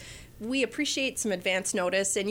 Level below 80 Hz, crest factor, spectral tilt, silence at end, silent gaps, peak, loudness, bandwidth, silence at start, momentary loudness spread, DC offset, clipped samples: -58 dBFS; 14 dB; -2.5 dB/octave; 0 s; none; -14 dBFS; -28 LUFS; 17 kHz; 0 s; 6 LU; under 0.1%; under 0.1%